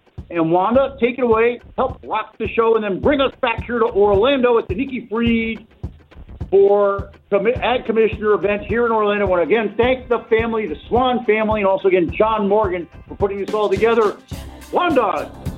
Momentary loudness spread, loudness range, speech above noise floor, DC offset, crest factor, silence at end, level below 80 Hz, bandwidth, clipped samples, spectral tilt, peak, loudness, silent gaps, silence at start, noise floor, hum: 9 LU; 1 LU; 22 dB; under 0.1%; 14 dB; 0 s; -38 dBFS; 11 kHz; under 0.1%; -7 dB/octave; -4 dBFS; -18 LUFS; none; 0.2 s; -39 dBFS; none